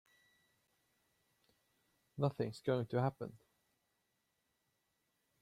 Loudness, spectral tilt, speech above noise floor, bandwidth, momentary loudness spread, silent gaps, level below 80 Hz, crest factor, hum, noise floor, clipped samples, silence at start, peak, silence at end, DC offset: -39 LUFS; -8 dB/octave; 46 dB; 14 kHz; 14 LU; none; -78 dBFS; 24 dB; none; -84 dBFS; under 0.1%; 2.15 s; -22 dBFS; 2.05 s; under 0.1%